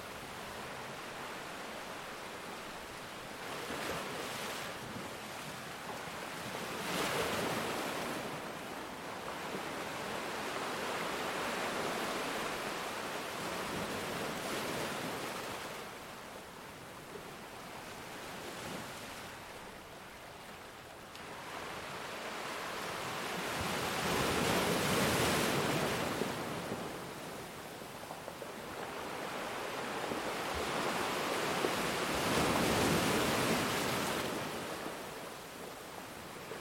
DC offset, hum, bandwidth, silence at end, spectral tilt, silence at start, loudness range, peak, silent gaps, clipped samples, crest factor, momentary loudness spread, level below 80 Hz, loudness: under 0.1%; none; 16.5 kHz; 0 s; -3.5 dB/octave; 0 s; 13 LU; -18 dBFS; none; under 0.1%; 20 dB; 15 LU; -62 dBFS; -37 LUFS